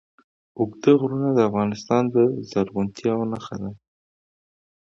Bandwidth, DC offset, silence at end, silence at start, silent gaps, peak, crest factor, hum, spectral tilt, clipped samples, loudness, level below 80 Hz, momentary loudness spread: 7.6 kHz; under 0.1%; 1.2 s; 0.55 s; none; -4 dBFS; 20 dB; none; -7.5 dB/octave; under 0.1%; -22 LUFS; -58 dBFS; 11 LU